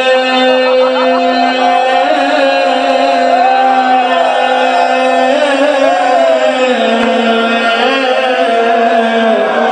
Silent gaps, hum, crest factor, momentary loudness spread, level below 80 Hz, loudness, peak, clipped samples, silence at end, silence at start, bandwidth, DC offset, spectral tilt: none; none; 10 dB; 2 LU; -60 dBFS; -10 LUFS; 0 dBFS; under 0.1%; 0 s; 0 s; 9.4 kHz; under 0.1%; -3 dB/octave